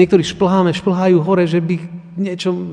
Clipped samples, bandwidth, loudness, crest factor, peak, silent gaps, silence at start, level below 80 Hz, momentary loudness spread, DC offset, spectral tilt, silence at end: under 0.1%; 10 kHz; -16 LUFS; 14 dB; 0 dBFS; none; 0 s; -50 dBFS; 10 LU; under 0.1%; -7 dB/octave; 0 s